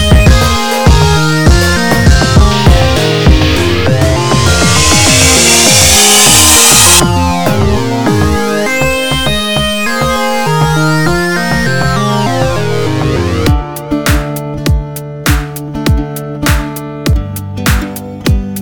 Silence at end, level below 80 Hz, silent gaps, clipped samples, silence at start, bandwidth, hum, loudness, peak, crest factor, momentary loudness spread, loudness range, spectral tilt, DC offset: 0 s; -18 dBFS; none; 0.5%; 0 s; over 20 kHz; none; -8 LUFS; 0 dBFS; 10 dB; 12 LU; 10 LU; -3.5 dB/octave; 5%